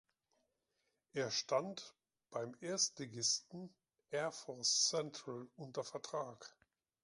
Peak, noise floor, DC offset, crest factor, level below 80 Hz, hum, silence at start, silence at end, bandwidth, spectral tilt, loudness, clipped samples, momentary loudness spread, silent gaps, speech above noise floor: -24 dBFS; -85 dBFS; under 0.1%; 20 dB; -88 dBFS; none; 1.15 s; 0.55 s; 11 kHz; -2 dB/octave; -40 LUFS; under 0.1%; 18 LU; none; 44 dB